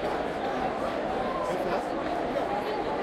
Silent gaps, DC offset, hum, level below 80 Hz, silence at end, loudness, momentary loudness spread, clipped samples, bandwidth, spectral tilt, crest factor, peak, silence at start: none; under 0.1%; none; -52 dBFS; 0 s; -30 LUFS; 1 LU; under 0.1%; 15.5 kHz; -5.5 dB/octave; 12 dB; -16 dBFS; 0 s